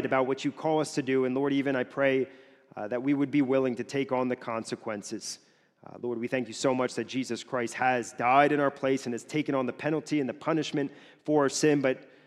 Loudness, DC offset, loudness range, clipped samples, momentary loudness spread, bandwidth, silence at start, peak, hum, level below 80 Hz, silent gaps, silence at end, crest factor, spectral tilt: -29 LUFS; under 0.1%; 5 LU; under 0.1%; 11 LU; 12.5 kHz; 0 s; -8 dBFS; none; -76 dBFS; none; 0.2 s; 20 dB; -5 dB/octave